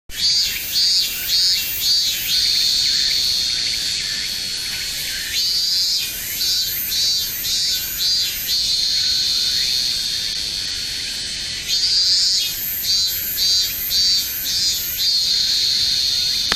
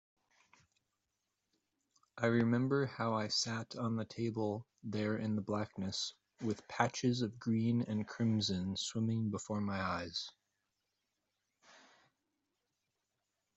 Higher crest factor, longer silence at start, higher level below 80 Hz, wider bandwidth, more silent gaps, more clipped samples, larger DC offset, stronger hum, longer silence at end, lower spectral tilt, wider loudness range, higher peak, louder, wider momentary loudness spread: about the same, 20 dB vs 22 dB; second, 0.1 s vs 2.15 s; first, -46 dBFS vs -76 dBFS; first, 16 kHz vs 8.2 kHz; neither; neither; neither; neither; second, 0 s vs 3.25 s; second, 1.5 dB/octave vs -5 dB/octave; second, 3 LU vs 7 LU; first, 0 dBFS vs -16 dBFS; first, -16 LUFS vs -37 LUFS; about the same, 7 LU vs 8 LU